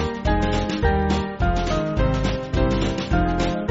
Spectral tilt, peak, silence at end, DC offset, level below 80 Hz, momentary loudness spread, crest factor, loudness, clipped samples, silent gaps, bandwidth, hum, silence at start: -5.5 dB/octave; -6 dBFS; 0 s; under 0.1%; -26 dBFS; 2 LU; 16 dB; -22 LUFS; under 0.1%; none; 8 kHz; none; 0 s